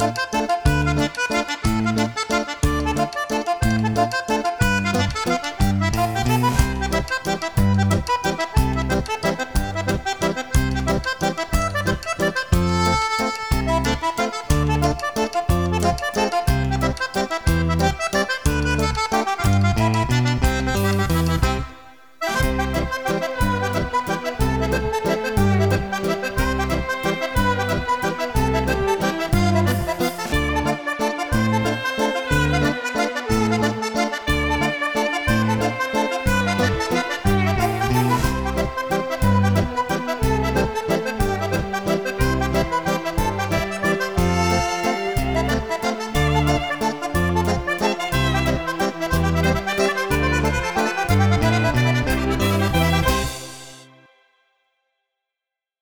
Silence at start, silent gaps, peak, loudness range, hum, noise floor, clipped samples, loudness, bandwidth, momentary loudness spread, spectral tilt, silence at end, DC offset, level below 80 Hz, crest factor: 0 s; none; -2 dBFS; 2 LU; none; -86 dBFS; under 0.1%; -21 LUFS; over 20 kHz; 4 LU; -5.5 dB/octave; 2 s; 0.4%; -30 dBFS; 18 dB